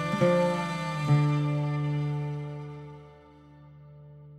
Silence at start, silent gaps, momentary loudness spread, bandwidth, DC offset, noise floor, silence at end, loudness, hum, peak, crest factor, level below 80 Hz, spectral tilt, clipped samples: 0 s; none; 18 LU; 10.5 kHz; under 0.1%; -52 dBFS; 0 s; -28 LUFS; none; -12 dBFS; 18 dB; -60 dBFS; -7.5 dB/octave; under 0.1%